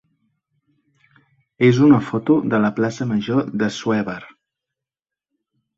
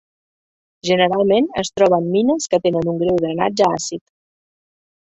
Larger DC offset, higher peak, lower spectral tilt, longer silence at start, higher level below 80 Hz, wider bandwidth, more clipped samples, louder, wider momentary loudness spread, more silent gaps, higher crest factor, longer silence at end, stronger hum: neither; about the same, -2 dBFS vs -2 dBFS; first, -7 dB/octave vs -5 dB/octave; first, 1.6 s vs 0.85 s; about the same, -58 dBFS vs -54 dBFS; about the same, 7.8 kHz vs 8.2 kHz; neither; about the same, -18 LUFS vs -17 LUFS; about the same, 9 LU vs 8 LU; neither; about the same, 18 dB vs 18 dB; first, 1.5 s vs 1.15 s; neither